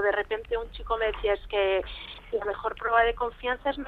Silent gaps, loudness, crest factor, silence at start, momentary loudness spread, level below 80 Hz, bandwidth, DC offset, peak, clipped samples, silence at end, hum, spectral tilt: none; -28 LUFS; 18 dB; 0 s; 9 LU; -44 dBFS; 4.7 kHz; under 0.1%; -10 dBFS; under 0.1%; 0 s; none; -6 dB/octave